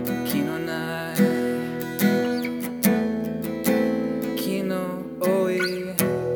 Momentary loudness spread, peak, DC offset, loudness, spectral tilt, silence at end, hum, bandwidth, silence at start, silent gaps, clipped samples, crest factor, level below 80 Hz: 6 LU; 0 dBFS; under 0.1%; -24 LUFS; -5.5 dB/octave; 0 s; none; over 20 kHz; 0 s; none; under 0.1%; 24 dB; -58 dBFS